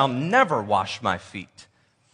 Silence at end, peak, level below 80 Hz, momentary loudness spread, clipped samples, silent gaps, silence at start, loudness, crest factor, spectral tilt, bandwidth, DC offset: 0.5 s; -4 dBFS; -66 dBFS; 18 LU; under 0.1%; none; 0 s; -23 LUFS; 20 dB; -5 dB/octave; 10.5 kHz; under 0.1%